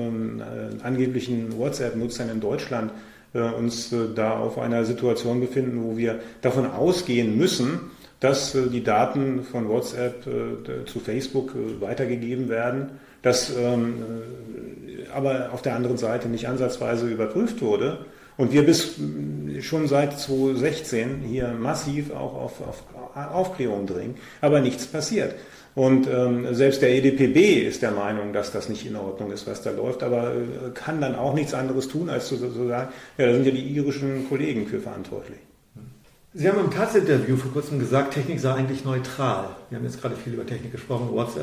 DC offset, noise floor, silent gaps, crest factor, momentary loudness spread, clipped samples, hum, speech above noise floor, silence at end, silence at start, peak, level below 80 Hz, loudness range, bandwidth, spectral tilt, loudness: under 0.1%; -49 dBFS; none; 18 dB; 13 LU; under 0.1%; none; 25 dB; 0 s; 0 s; -6 dBFS; -56 dBFS; 6 LU; 16 kHz; -6 dB/octave; -25 LUFS